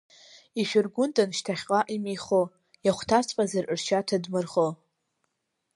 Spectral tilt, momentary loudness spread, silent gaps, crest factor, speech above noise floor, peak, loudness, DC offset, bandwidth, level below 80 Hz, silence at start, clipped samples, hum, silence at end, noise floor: -4.5 dB/octave; 6 LU; none; 20 dB; 54 dB; -8 dBFS; -27 LUFS; under 0.1%; 11.5 kHz; -66 dBFS; 0.55 s; under 0.1%; none; 1 s; -80 dBFS